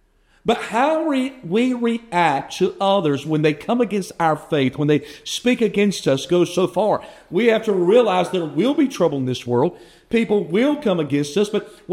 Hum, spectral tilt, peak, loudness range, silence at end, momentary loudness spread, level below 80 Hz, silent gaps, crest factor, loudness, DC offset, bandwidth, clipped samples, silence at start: none; -5.5 dB/octave; -2 dBFS; 2 LU; 0 s; 5 LU; -58 dBFS; none; 18 dB; -20 LUFS; under 0.1%; 15.5 kHz; under 0.1%; 0.45 s